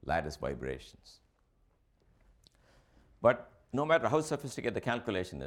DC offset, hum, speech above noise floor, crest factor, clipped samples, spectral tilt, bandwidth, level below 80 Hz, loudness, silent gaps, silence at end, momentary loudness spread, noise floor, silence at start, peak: under 0.1%; none; 38 dB; 24 dB; under 0.1%; -5.5 dB/octave; 16 kHz; -56 dBFS; -33 LUFS; none; 0 s; 12 LU; -71 dBFS; 0.05 s; -12 dBFS